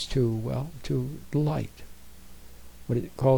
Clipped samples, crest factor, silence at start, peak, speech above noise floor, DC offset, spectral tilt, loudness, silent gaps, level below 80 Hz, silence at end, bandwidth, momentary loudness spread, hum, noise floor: under 0.1%; 18 dB; 0 s; -10 dBFS; 23 dB; 0.5%; -7.5 dB/octave; -30 LUFS; none; -46 dBFS; 0 s; over 20 kHz; 24 LU; none; -49 dBFS